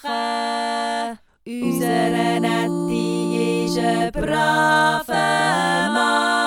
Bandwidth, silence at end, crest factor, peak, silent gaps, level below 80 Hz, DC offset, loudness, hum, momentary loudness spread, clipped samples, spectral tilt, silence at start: 17 kHz; 0 s; 16 dB; -4 dBFS; none; -46 dBFS; under 0.1%; -20 LUFS; none; 7 LU; under 0.1%; -4.5 dB/octave; 0.05 s